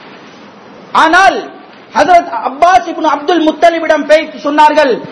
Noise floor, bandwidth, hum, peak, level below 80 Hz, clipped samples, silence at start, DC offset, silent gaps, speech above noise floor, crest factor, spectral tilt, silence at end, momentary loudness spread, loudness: -34 dBFS; 11 kHz; none; 0 dBFS; -48 dBFS; 3%; 0.05 s; under 0.1%; none; 25 dB; 10 dB; -3.5 dB/octave; 0 s; 8 LU; -9 LUFS